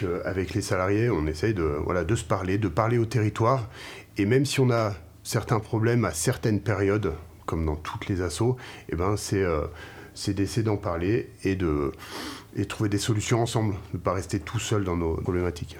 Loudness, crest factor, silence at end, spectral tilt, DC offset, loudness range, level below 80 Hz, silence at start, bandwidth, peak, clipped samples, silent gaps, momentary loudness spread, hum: -27 LUFS; 20 dB; 0 s; -6 dB/octave; under 0.1%; 3 LU; -44 dBFS; 0 s; 16.5 kHz; -6 dBFS; under 0.1%; none; 9 LU; none